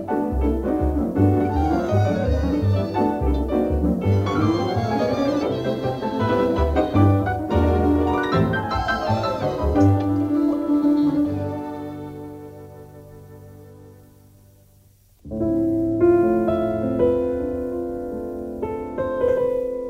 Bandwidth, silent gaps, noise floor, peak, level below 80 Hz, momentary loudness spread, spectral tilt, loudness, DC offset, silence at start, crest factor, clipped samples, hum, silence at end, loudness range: 15 kHz; none; -54 dBFS; -6 dBFS; -32 dBFS; 11 LU; -8.5 dB/octave; -21 LUFS; under 0.1%; 0 s; 16 dB; under 0.1%; none; 0 s; 8 LU